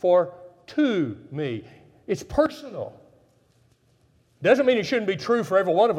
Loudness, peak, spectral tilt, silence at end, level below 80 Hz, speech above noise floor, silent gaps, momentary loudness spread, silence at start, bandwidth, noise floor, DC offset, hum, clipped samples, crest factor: -24 LUFS; -6 dBFS; -6 dB/octave; 0 s; -56 dBFS; 40 dB; none; 16 LU; 0.05 s; 13 kHz; -62 dBFS; under 0.1%; none; under 0.1%; 18 dB